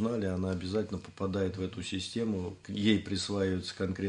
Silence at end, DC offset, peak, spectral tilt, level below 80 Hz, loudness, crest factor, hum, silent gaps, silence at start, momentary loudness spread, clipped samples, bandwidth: 0 s; under 0.1%; -12 dBFS; -5.5 dB/octave; -64 dBFS; -33 LUFS; 20 dB; none; none; 0 s; 8 LU; under 0.1%; 10.5 kHz